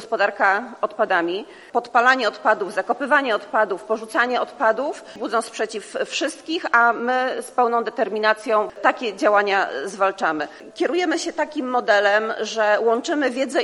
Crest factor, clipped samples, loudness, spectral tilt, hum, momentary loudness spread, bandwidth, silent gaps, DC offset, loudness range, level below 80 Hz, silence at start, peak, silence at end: 20 dB; under 0.1%; -21 LUFS; -2.5 dB/octave; none; 9 LU; 12 kHz; none; under 0.1%; 2 LU; -72 dBFS; 0 s; -2 dBFS; 0 s